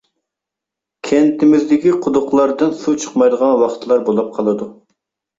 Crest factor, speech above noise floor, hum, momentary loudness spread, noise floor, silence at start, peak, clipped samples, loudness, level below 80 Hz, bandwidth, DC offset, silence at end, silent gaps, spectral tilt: 14 dB; 70 dB; none; 7 LU; -84 dBFS; 1.05 s; -2 dBFS; under 0.1%; -15 LUFS; -58 dBFS; 7.8 kHz; under 0.1%; 0.65 s; none; -6 dB/octave